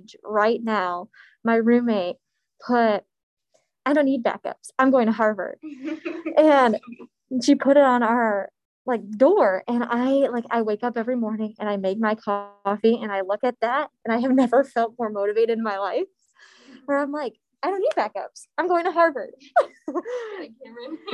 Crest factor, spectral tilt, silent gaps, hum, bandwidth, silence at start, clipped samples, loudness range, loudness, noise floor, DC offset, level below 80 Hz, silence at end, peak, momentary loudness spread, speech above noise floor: 18 dB; -5.5 dB/octave; 3.23-3.37 s, 8.65-8.85 s; none; 11 kHz; 0.1 s; under 0.1%; 5 LU; -22 LUFS; -54 dBFS; under 0.1%; -74 dBFS; 0 s; -4 dBFS; 14 LU; 32 dB